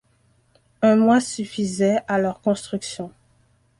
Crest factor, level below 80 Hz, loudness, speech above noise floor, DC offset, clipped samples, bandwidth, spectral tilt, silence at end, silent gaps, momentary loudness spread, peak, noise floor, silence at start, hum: 16 dB; -60 dBFS; -21 LUFS; 41 dB; under 0.1%; under 0.1%; 11.5 kHz; -5.5 dB/octave; 0.7 s; none; 14 LU; -6 dBFS; -62 dBFS; 0.8 s; none